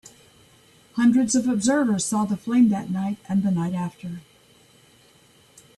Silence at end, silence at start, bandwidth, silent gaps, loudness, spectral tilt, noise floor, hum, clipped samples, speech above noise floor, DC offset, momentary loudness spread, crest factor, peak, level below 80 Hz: 1.55 s; 0.95 s; 12.5 kHz; none; -22 LUFS; -5.5 dB/octave; -56 dBFS; none; under 0.1%; 34 dB; under 0.1%; 13 LU; 16 dB; -8 dBFS; -62 dBFS